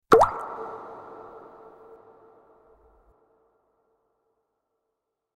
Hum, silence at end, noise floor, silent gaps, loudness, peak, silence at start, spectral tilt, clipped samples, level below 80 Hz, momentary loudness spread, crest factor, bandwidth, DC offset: none; 4 s; -82 dBFS; none; -24 LUFS; 0 dBFS; 0.1 s; -5.5 dB/octave; under 0.1%; -56 dBFS; 30 LU; 30 dB; 15.5 kHz; under 0.1%